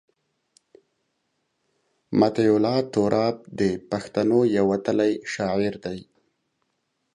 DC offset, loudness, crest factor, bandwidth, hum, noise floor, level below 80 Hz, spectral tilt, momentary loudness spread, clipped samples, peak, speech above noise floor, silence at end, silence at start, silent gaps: under 0.1%; -23 LUFS; 20 dB; 10.5 kHz; none; -75 dBFS; -60 dBFS; -6.5 dB/octave; 8 LU; under 0.1%; -4 dBFS; 53 dB; 1.1 s; 2.1 s; none